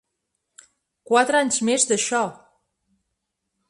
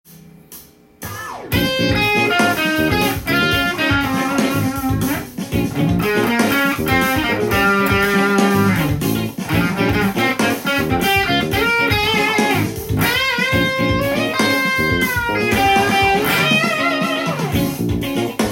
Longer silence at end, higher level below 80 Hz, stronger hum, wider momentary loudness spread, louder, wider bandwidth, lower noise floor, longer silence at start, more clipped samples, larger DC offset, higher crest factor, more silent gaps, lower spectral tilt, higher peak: first, 1.35 s vs 0 s; second, -70 dBFS vs -36 dBFS; neither; about the same, 6 LU vs 6 LU; second, -20 LUFS vs -16 LUFS; second, 11.5 kHz vs 17 kHz; first, -79 dBFS vs -42 dBFS; first, 1.1 s vs 0.5 s; neither; neither; about the same, 20 dB vs 16 dB; neither; second, -2 dB/octave vs -4.5 dB/octave; about the same, -4 dBFS vs -2 dBFS